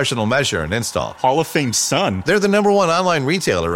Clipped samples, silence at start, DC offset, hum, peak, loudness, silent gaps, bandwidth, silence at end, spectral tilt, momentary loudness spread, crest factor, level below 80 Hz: under 0.1%; 0 s; under 0.1%; none; -4 dBFS; -17 LUFS; none; 16.5 kHz; 0 s; -4 dB/octave; 5 LU; 14 dB; -44 dBFS